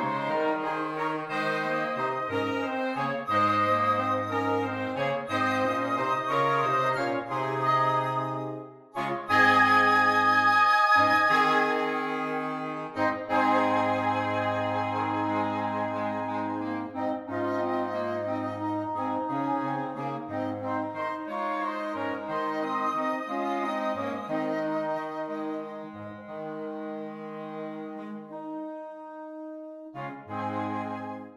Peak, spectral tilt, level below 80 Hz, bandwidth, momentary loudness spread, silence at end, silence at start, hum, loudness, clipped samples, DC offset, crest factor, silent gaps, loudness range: -10 dBFS; -5.5 dB/octave; -72 dBFS; 15.5 kHz; 16 LU; 0 s; 0 s; none; -27 LUFS; under 0.1%; under 0.1%; 18 dB; none; 14 LU